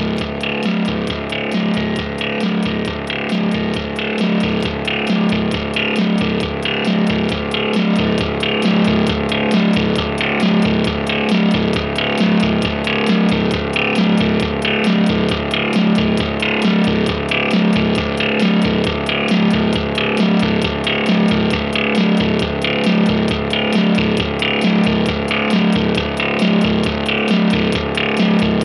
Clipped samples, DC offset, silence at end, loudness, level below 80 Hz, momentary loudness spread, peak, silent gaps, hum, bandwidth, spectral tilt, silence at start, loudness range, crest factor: under 0.1%; under 0.1%; 0 s; -16 LUFS; -34 dBFS; 4 LU; -2 dBFS; none; none; 11 kHz; -6 dB/octave; 0 s; 3 LU; 14 dB